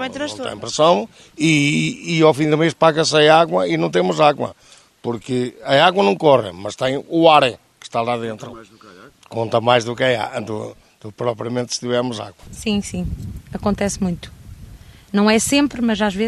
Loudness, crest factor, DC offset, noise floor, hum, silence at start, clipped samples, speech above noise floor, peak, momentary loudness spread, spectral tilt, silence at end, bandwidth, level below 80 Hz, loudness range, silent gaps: -17 LUFS; 18 dB; under 0.1%; -41 dBFS; none; 0 s; under 0.1%; 23 dB; 0 dBFS; 15 LU; -4.5 dB/octave; 0 s; 13.5 kHz; -44 dBFS; 8 LU; none